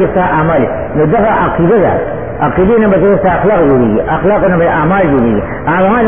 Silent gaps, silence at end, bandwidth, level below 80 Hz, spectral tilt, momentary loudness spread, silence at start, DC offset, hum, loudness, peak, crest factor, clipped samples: none; 0 s; 3.6 kHz; -30 dBFS; -12 dB/octave; 5 LU; 0 s; 3%; none; -10 LUFS; 0 dBFS; 10 dB; under 0.1%